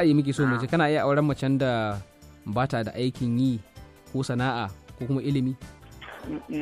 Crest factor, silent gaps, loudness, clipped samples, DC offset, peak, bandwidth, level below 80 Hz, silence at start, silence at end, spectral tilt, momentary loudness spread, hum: 16 dB; none; -26 LUFS; under 0.1%; under 0.1%; -10 dBFS; 14 kHz; -52 dBFS; 0 s; 0 s; -7 dB/octave; 15 LU; none